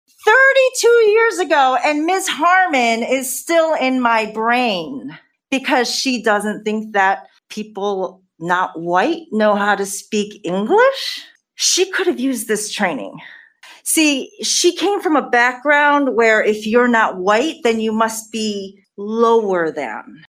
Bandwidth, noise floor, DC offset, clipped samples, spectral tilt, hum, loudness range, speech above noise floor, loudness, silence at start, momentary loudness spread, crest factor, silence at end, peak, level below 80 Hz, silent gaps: 16 kHz; -44 dBFS; under 0.1%; under 0.1%; -2.5 dB/octave; none; 5 LU; 27 dB; -16 LUFS; 0.25 s; 12 LU; 16 dB; 0.2 s; -2 dBFS; -66 dBFS; none